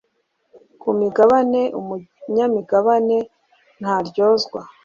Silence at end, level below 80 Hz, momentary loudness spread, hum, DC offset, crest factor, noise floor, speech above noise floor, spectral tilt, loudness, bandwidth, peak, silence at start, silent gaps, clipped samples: 0.15 s; -64 dBFS; 15 LU; none; under 0.1%; 16 dB; -69 dBFS; 51 dB; -6 dB/octave; -18 LUFS; 7.4 kHz; -2 dBFS; 0.85 s; none; under 0.1%